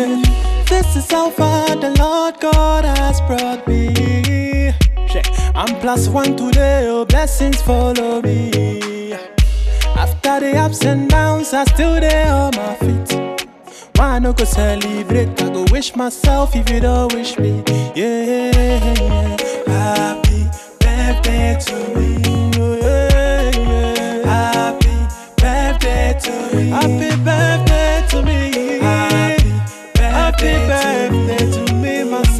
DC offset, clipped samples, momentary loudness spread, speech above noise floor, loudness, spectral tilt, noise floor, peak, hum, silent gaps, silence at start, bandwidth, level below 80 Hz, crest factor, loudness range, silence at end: under 0.1%; under 0.1%; 5 LU; 24 dB; -15 LUFS; -5.5 dB/octave; -38 dBFS; -2 dBFS; none; none; 0 s; 14 kHz; -18 dBFS; 12 dB; 2 LU; 0 s